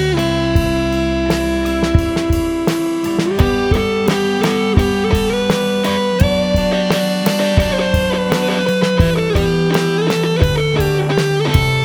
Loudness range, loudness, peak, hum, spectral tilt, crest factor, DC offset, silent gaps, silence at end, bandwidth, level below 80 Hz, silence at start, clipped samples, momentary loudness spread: 1 LU; -16 LUFS; 0 dBFS; none; -6 dB/octave; 14 dB; under 0.1%; none; 0 s; 19.5 kHz; -24 dBFS; 0 s; under 0.1%; 3 LU